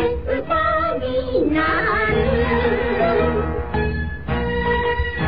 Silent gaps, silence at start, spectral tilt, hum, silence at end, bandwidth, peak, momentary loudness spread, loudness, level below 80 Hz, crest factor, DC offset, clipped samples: none; 0 s; -10 dB/octave; none; 0 s; 5.2 kHz; -6 dBFS; 6 LU; -20 LUFS; -30 dBFS; 14 dB; 2%; under 0.1%